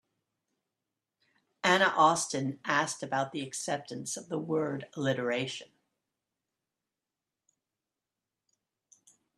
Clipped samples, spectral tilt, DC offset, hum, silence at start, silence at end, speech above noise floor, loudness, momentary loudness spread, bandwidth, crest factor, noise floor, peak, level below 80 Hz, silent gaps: under 0.1%; -3.5 dB/octave; under 0.1%; none; 1.65 s; 3.75 s; 59 dB; -30 LUFS; 11 LU; 13 kHz; 26 dB; -90 dBFS; -8 dBFS; -78 dBFS; none